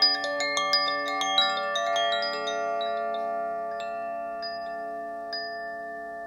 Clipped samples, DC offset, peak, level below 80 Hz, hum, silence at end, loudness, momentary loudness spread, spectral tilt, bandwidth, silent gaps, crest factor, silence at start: under 0.1%; under 0.1%; -10 dBFS; -70 dBFS; none; 0 s; -28 LUFS; 12 LU; -0.5 dB/octave; 16 kHz; none; 20 dB; 0 s